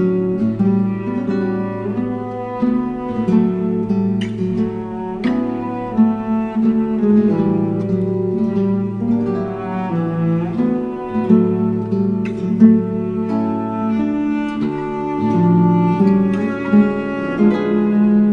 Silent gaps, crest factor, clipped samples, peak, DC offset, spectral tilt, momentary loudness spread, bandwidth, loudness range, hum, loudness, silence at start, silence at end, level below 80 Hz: none; 16 dB; under 0.1%; 0 dBFS; under 0.1%; -10 dB/octave; 8 LU; 5.2 kHz; 3 LU; none; -17 LUFS; 0 s; 0 s; -46 dBFS